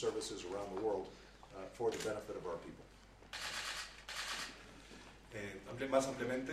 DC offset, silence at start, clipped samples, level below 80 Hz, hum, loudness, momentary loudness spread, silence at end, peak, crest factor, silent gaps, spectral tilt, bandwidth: under 0.1%; 0 s; under 0.1%; -64 dBFS; none; -42 LUFS; 19 LU; 0 s; -18 dBFS; 24 dB; none; -3.5 dB/octave; 15 kHz